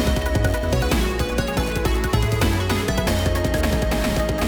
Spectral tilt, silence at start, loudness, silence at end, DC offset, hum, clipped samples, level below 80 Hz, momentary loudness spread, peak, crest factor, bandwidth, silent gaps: -5.5 dB/octave; 0 s; -21 LUFS; 0 s; under 0.1%; none; under 0.1%; -26 dBFS; 2 LU; -6 dBFS; 14 dB; over 20 kHz; none